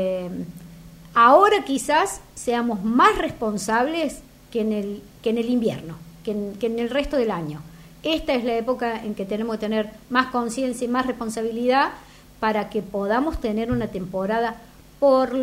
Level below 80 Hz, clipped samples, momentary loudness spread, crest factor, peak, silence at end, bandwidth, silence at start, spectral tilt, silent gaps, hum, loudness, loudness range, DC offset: -46 dBFS; under 0.1%; 13 LU; 20 dB; -2 dBFS; 0 s; 16 kHz; 0 s; -5 dB/octave; none; none; -22 LUFS; 6 LU; under 0.1%